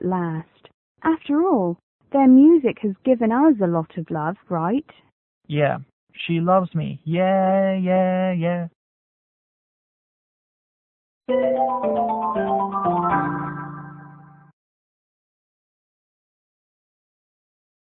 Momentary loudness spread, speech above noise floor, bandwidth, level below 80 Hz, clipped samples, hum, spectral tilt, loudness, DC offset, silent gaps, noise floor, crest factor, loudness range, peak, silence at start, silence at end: 12 LU; 26 dB; 3.9 kHz; -62 dBFS; under 0.1%; none; -12.5 dB/octave; -20 LUFS; under 0.1%; 0.74-0.95 s, 1.83-1.99 s, 5.12-5.41 s, 5.93-6.07 s, 8.75-11.21 s; -46 dBFS; 16 dB; 10 LU; -6 dBFS; 0 s; 3.7 s